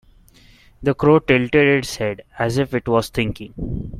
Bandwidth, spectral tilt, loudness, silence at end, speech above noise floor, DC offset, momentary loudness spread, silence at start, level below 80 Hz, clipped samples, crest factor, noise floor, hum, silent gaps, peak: 15.5 kHz; -6 dB/octave; -19 LUFS; 0 s; 31 dB; under 0.1%; 11 LU; 0.8 s; -40 dBFS; under 0.1%; 18 dB; -49 dBFS; none; none; -2 dBFS